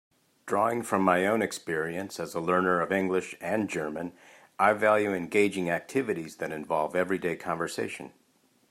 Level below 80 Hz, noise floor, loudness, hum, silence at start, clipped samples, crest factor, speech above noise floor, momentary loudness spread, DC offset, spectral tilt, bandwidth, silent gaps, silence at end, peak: -72 dBFS; -67 dBFS; -28 LUFS; none; 0.45 s; under 0.1%; 20 dB; 39 dB; 11 LU; under 0.1%; -5.5 dB/octave; 16 kHz; none; 0.65 s; -8 dBFS